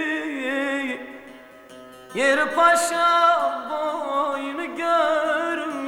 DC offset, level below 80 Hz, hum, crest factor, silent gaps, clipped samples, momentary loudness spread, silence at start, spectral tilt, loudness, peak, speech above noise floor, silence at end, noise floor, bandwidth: under 0.1%; -68 dBFS; none; 18 dB; none; under 0.1%; 12 LU; 0 s; -2 dB/octave; -21 LUFS; -6 dBFS; 25 dB; 0 s; -44 dBFS; 18.5 kHz